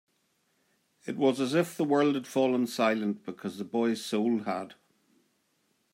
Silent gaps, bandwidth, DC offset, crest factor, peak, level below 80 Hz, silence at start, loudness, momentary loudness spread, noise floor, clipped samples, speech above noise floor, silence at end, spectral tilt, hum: none; 16 kHz; under 0.1%; 18 dB; -12 dBFS; -82 dBFS; 1.05 s; -29 LUFS; 12 LU; -74 dBFS; under 0.1%; 45 dB; 1.2 s; -5.5 dB/octave; none